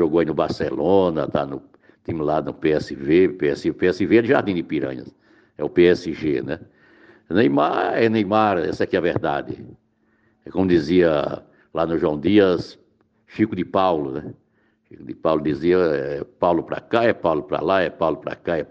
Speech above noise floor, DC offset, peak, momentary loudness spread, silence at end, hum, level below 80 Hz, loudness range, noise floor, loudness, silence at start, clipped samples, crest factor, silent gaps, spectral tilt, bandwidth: 44 dB; under 0.1%; -4 dBFS; 13 LU; 0.05 s; none; -52 dBFS; 2 LU; -64 dBFS; -21 LUFS; 0 s; under 0.1%; 18 dB; none; -7.5 dB/octave; 7.6 kHz